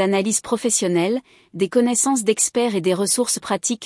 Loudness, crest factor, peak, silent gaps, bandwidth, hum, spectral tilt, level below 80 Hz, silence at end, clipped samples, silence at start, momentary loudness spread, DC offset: -19 LUFS; 14 dB; -6 dBFS; none; 12 kHz; none; -3.5 dB/octave; -64 dBFS; 0 s; under 0.1%; 0 s; 5 LU; under 0.1%